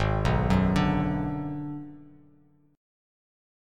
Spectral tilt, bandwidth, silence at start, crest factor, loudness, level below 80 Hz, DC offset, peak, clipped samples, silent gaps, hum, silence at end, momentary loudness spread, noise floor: -7.5 dB/octave; 10 kHz; 0 s; 18 dB; -27 LUFS; -38 dBFS; under 0.1%; -10 dBFS; under 0.1%; none; none; 1.65 s; 15 LU; -61 dBFS